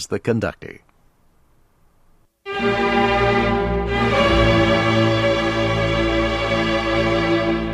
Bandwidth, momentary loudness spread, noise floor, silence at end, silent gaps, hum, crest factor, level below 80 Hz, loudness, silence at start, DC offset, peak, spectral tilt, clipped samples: 12.5 kHz; 8 LU; -56 dBFS; 0 s; none; none; 16 dB; -32 dBFS; -18 LUFS; 0 s; under 0.1%; -4 dBFS; -6 dB/octave; under 0.1%